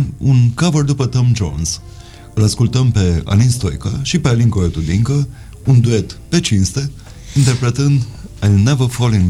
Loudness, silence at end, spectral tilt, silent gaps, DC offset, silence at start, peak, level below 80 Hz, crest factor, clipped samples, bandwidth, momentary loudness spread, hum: -15 LUFS; 0 s; -6 dB/octave; none; 0.2%; 0 s; -2 dBFS; -32 dBFS; 12 dB; under 0.1%; 12.5 kHz; 8 LU; none